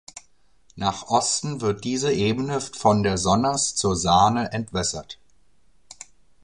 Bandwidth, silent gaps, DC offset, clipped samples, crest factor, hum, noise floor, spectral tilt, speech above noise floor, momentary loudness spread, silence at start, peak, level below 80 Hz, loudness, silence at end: 11 kHz; none; 0.2%; under 0.1%; 20 dB; none; -64 dBFS; -4 dB/octave; 42 dB; 23 LU; 0.15 s; -4 dBFS; -46 dBFS; -22 LUFS; 0.5 s